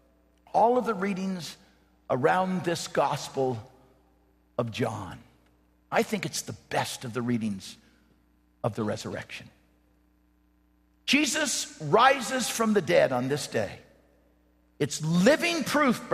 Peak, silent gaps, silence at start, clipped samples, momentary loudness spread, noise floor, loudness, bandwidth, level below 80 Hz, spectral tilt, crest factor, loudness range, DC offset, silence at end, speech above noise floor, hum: -6 dBFS; none; 0.55 s; under 0.1%; 15 LU; -65 dBFS; -27 LUFS; 14.5 kHz; -64 dBFS; -4 dB/octave; 22 dB; 9 LU; under 0.1%; 0 s; 38 dB; none